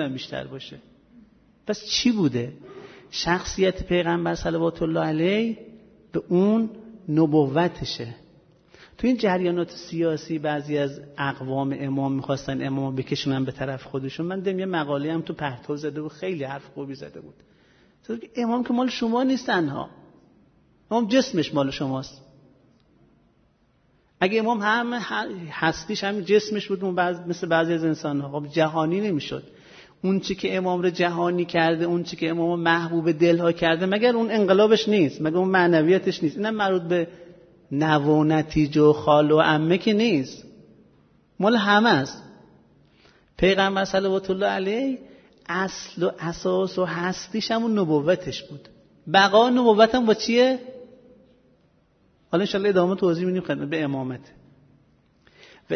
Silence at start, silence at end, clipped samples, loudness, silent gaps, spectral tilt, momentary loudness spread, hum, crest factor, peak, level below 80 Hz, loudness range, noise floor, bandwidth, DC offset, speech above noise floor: 0 s; 0 s; under 0.1%; -23 LUFS; none; -6 dB/octave; 14 LU; none; 20 dB; -2 dBFS; -54 dBFS; 7 LU; -63 dBFS; 6.6 kHz; under 0.1%; 40 dB